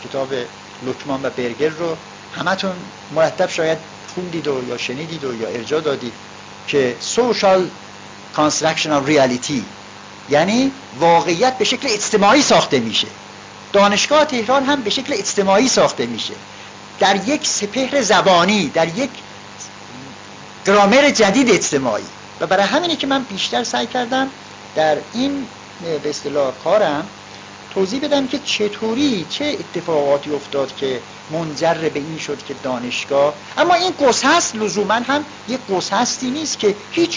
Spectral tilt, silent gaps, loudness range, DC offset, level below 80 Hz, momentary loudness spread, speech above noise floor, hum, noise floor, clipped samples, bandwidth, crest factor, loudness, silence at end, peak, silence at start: -3.5 dB/octave; none; 6 LU; under 0.1%; -56 dBFS; 18 LU; 19 dB; none; -37 dBFS; under 0.1%; 7.6 kHz; 14 dB; -17 LUFS; 0 s; -4 dBFS; 0 s